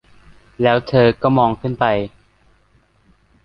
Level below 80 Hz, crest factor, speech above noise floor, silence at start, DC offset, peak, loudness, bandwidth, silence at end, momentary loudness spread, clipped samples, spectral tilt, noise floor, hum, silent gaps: -48 dBFS; 18 dB; 41 dB; 0.6 s; under 0.1%; -2 dBFS; -16 LUFS; 6 kHz; 1.35 s; 6 LU; under 0.1%; -9 dB/octave; -57 dBFS; none; none